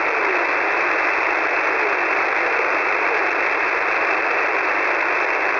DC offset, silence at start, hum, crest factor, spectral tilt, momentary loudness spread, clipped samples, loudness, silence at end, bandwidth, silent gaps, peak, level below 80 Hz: under 0.1%; 0 s; none; 12 dB; -3 dB/octave; 1 LU; under 0.1%; -18 LUFS; 0 s; 6 kHz; none; -8 dBFS; -60 dBFS